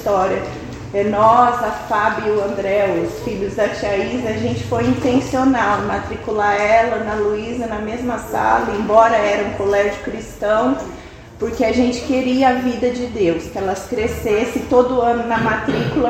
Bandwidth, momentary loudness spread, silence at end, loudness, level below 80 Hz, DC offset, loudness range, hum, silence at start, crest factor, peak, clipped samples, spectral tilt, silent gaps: 16 kHz; 9 LU; 0 s; -18 LUFS; -40 dBFS; under 0.1%; 2 LU; none; 0 s; 18 dB; 0 dBFS; under 0.1%; -6 dB/octave; none